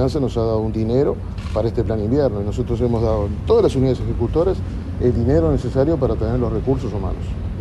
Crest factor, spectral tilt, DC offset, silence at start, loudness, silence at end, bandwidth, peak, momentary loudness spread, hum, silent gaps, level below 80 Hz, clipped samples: 16 dB; -9 dB/octave; under 0.1%; 0 s; -20 LUFS; 0 s; 11.5 kHz; -4 dBFS; 8 LU; none; none; -28 dBFS; under 0.1%